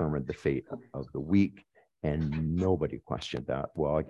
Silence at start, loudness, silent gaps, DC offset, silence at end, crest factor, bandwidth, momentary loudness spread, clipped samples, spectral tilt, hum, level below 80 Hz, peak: 0 s; -32 LUFS; none; under 0.1%; 0 s; 18 dB; 9.8 kHz; 10 LU; under 0.1%; -8 dB/octave; none; -46 dBFS; -14 dBFS